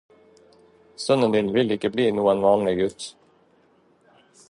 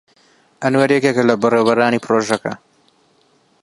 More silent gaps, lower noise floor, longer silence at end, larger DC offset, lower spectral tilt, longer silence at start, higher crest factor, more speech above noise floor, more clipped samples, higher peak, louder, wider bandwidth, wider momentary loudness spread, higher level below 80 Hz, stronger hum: neither; about the same, -60 dBFS vs -57 dBFS; first, 1.4 s vs 1.05 s; neither; about the same, -5.5 dB/octave vs -5.5 dB/octave; first, 1 s vs 0.6 s; about the same, 18 dB vs 18 dB; about the same, 39 dB vs 42 dB; neither; second, -6 dBFS vs 0 dBFS; second, -22 LUFS vs -16 LUFS; about the same, 11.5 kHz vs 11.5 kHz; about the same, 11 LU vs 9 LU; first, -58 dBFS vs -64 dBFS; neither